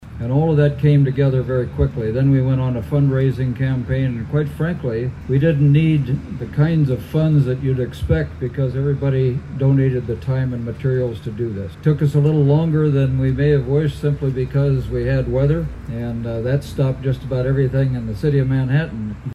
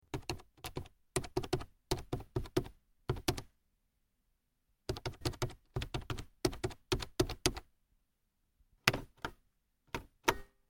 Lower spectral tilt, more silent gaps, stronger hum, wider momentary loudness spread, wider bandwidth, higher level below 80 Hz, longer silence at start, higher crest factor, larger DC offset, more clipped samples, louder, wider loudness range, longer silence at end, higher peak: first, -9.5 dB/octave vs -4 dB/octave; neither; neither; second, 8 LU vs 13 LU; second, 5.2 kHz vs 17 kHz; first, -34 dBFS vs -50 dBFS; second, 0 s vs 0.15 s; second, 14 dB vs 38 dB; neither; neither; first, -19 LUFS vs -39 LUFS; about the same, 3 LU vs 5 LU; second, 0 s vs 0.25 s; about the same, -4 dBFS vs -2 dBFS